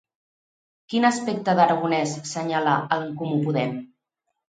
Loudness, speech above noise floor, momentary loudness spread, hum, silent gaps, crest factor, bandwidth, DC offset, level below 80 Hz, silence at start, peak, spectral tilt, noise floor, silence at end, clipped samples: -23 LUFS; 57 dB; 9 LU; none; none; 20 dB; 9.4 kHz; under 0.1%; -72 dBFS; 0.9 s; -4 dBFS; -5.5 dB/octave; -79 dBFS; 0.65 s; under 0.1%